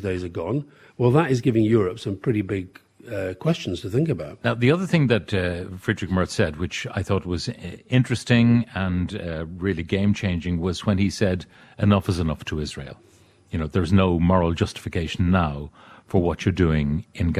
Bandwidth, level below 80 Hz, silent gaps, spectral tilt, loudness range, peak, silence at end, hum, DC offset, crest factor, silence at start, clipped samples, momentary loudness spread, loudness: 13 kHz; -42 dBFS; none; -7 dB/octave; 2 LU; -4 dBFS; 0 s; none; under 0.1%; 18 dB; 0 s; under 0.1%; 11 LU; -23 LUFS